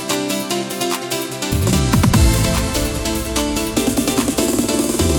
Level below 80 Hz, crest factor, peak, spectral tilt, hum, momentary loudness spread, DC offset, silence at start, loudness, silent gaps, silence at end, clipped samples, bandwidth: -26 dBFS; 14 dB; -2 dBFS; -4.5 dB/octave; none; 7 LU; under 0.1%; 0 s; -17 LUFS; none; 0 s; under 0.1%; 19 kHz